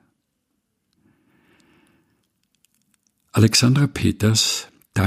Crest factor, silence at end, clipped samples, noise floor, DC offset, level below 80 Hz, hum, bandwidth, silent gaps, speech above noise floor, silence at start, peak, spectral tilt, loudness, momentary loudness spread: 22 dB; 0 s; under 0.1%; -74 dBFS; under 0.1%; -52 dBFS; none; 15.5 kHz; none; 57 dB; 3.35 s; -2 dBFS; -4.5 dB/octave; -18 LUFS; 11 LU